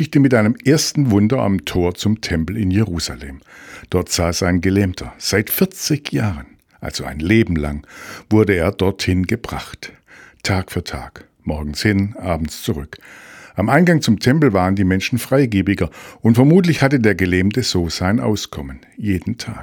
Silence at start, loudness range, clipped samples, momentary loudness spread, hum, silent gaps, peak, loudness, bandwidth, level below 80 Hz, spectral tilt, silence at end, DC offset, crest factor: 0 s; 7 LU; under 0.1%; 16 LU; none; none; 0 dBFS; -17 LUFS; 19 kHz; -38 dBFS; -5.5 dB/octave; 0 s; under 0.1%; 18 dB